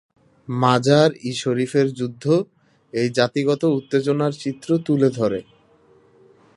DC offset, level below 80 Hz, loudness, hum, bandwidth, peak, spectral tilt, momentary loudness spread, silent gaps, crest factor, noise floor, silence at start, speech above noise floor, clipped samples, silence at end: under 0.1%; -64 dBFS; -20 LUFS; none; 11.5 kHz; 0 dBFS; -6.5 dB/octave; 10 LU; none; 20 dB; -55 dBFS; 0.5 s; 35 dB; under 0.1%; 1.15 s